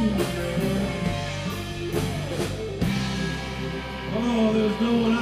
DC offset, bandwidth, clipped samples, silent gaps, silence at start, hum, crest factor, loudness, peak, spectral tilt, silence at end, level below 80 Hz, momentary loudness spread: under 0.1%; 15.5 kHz; under 0.1%; none; 0 s; none; 14 dB; -26 LUFS; -12 dBFS; -6 dB/octave; 0 s; -40 dBFS; 8 LU